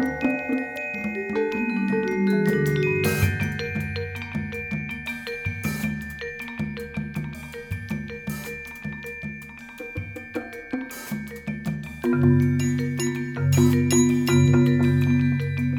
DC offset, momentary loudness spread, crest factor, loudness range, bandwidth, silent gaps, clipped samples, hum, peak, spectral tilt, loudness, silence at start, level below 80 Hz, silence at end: under 0.1%; 14 LU; 18 dB; 13 LU; 19.5 kHz; none; under 0.1%; none; -6 dBFS; -6 dB/octave; -25 LUFS; 0 s; -50 dBFS; 0 s